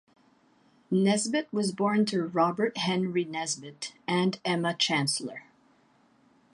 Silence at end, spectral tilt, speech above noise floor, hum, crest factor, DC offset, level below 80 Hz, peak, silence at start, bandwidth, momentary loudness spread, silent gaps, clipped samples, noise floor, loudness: 1.1 s; -4.5 dB/octave; 36 dB; none; 18 dB; under 0.1%; -76 dBFS; -12 dBFS; 0.9 s; 11.5 kHz; 8 LU; none; under 0.1%; -64 dBFS; -28 LUFS